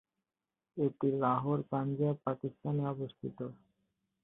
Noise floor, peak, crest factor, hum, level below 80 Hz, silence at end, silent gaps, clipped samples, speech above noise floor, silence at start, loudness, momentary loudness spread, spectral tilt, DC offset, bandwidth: under -90 dBFS; -18 dBFS; 18 dB; none; -74 dBFS; 0.7 s; none; under 0.1%; over 56 dB; 0.75 s; -35 LUFS; 11 LU; -12 dB/octave; under 0.1%; 3.9 kHz